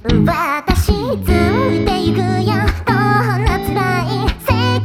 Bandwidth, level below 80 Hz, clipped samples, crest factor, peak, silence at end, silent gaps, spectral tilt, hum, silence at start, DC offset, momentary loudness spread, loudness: 17 kHz; -24 dBFS; under 0.1%; 14 dB; 0 dBFS; 0 s; none; -6.5 dB/octave; none; 0.05 s; under 0.1%; 3 LU; -15 LUFS